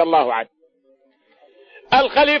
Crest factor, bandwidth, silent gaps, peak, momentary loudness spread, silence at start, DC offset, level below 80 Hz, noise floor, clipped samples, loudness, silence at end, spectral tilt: 16 dB; 6.6 kHz; none; -4 dBFS; 12 LU; 0 s; under 0.1%; -52 dBFS; -59 dBFS; under 0.1%; -17 LUFS; 0 s; -5 dB/octave